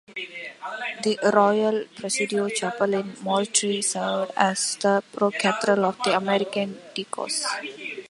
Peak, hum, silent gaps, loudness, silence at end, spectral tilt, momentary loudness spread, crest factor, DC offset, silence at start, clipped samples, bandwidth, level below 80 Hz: -2 dBFS; none; none; -24 LUFS; 0.05 s; -3 dB/octave; 11 LU; 22 dB; under 0.1%; 0.1 s; under 0.1%; 11.5 kHz; -74 dBFS